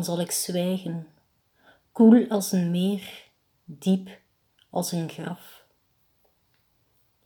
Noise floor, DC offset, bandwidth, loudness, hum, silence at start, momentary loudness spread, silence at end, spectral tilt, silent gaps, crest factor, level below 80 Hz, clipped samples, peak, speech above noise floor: -68 dBFS; under 0.1%; 19.5 kHz; -24 LUFS; none; 0 s; 24 LU; 1.9 s; -5.5 dB/octave; none; 22 dB; -76 dBFS; under 0.1%; -6 dBFS; 45 dB